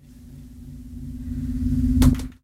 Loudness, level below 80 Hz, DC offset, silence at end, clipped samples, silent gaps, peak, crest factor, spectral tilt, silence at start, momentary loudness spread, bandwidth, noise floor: -22 LUFS; -28 dBFS; under 0.1%; 0.1 s; under 0.1%; none; -4 dBFS; 20 dB; -7 dB/octave; 0.1 s; 24 LU; 16 kHz; -43 dBFS